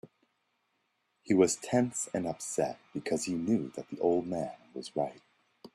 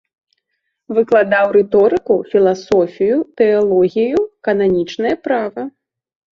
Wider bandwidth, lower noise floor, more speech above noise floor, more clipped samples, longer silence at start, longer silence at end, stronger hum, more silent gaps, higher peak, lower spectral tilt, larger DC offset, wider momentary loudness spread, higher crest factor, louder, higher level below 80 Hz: first, 14 kHz vs 7.2 kHz; first, -78 dBFS vs -73 dBFS; second, 47 dB vs 58 dB; neither; second, 0.05 s vs 0.9 s; second, 0.1 s vs 0.65 s; neither; neither; second, -10 dBFS vs -2 dBFS; second, -5 dB/octave vs -7 dB/octave; neither; first, 12 LU vs 7 LU; first, 22 dB vs 14 dB; second, -32 LUFS vs -15 LUFS; second, -72 dBFS vs -54 dBFS